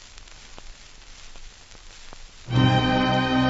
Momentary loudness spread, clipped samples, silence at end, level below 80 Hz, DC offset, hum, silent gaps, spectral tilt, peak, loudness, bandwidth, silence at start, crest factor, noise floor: 26 LU; under 0.1%; 0 s; -42 dBFS; under 0.1%; none; none; -6 dB/octave; -6 dBFS; -21 LUFS; 8 kHz; 0.15 s; 18 dB; -45 dBFS